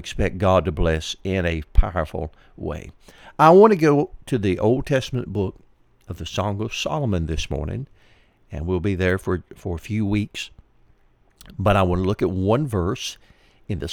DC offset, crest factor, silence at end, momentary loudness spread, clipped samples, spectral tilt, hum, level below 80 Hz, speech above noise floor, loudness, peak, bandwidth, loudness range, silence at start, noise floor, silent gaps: under 0.1%; 22 dB; 0 s; 15 LU; under 0.1%; -6.5 dB/octave; none; -32 dBFS; 36 dB; -22 LUFS; 0 dBFS; 16 kHz; 8 LU; 0 s; -57 dBFS; none